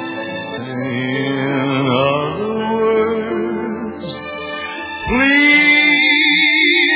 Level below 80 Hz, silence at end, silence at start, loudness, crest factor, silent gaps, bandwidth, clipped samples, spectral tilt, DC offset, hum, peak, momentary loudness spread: -44 dBFS; 0 s; 0 s; -14 LUFS; 14 dB; none; 4 kHz; under 0.1%; -7.5 dB/octave; under 0.1%; none; -2 dBFS; 16 LU